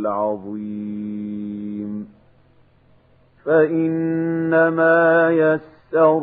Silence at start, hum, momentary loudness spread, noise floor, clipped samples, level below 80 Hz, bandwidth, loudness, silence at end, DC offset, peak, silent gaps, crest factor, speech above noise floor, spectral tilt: 0 s; none; 14 LU; -54 dBFS; under 0.1%; -66 dBFS; 4 kHz; -19 LUFS; 0 s; under 0.1%; -4 dBFS; none; 16 dB; 37 dB; -11.5 dB/octave